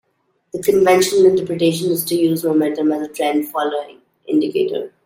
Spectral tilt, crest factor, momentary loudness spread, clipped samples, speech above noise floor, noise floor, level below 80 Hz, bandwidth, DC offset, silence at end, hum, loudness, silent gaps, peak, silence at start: -5 dB/octave; 16 dB; 9 LU; under 0.1%; 48 dB; -65 dBFS; -60 dBFS; 16.5 kHz; under 0.1%; 0.15 s; none; -17 LUFS; none; -2 dBFS; 0.55 s